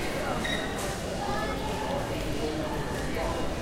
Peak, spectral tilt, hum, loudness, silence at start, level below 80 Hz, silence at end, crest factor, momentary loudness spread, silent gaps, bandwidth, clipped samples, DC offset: -18 dBFS; -4.5 dB/octave; none; -31 LUFS; 0 s; -40 dBFS; 0 s; 14 dB; 2 LU; none; 16 kHz; under 0.1%; under 0.1%